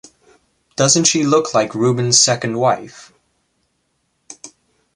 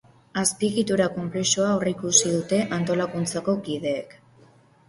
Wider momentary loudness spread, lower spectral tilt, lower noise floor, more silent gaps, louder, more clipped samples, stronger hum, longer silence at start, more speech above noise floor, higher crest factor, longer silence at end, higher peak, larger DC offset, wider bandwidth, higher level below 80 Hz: first, 25 LU vs 9 LU; about the same, -3 dB/octave vs -3.5 dB/octave; first, -67 dBFS vs -55 dBFS; neither; first, -14 LUFS vs -23 LUFS; neither; neither; first, 0.8 s vs 0.35 s; first, 52 dB vs 31 dB; about the same, 18 dB vs 20 dB; second, 0.5 s vs 0.75 s; first, 0 dBFS vs -4 dBFS; neither; about the same, 11.5 kHz vs 11.5 kHz; about the same, -60 dBFS vs -60 dBFS